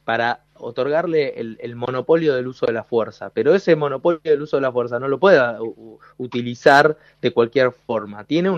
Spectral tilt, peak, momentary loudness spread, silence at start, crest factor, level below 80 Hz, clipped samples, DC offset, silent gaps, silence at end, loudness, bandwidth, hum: -6.5 dB/octave; 0 dBFS; 14 LU; 0.05 s; 18 dB; -62 dBFS; under 0.1%; under 0.1%; none; 0 s; -19 LUFS; 8.8 kHz; none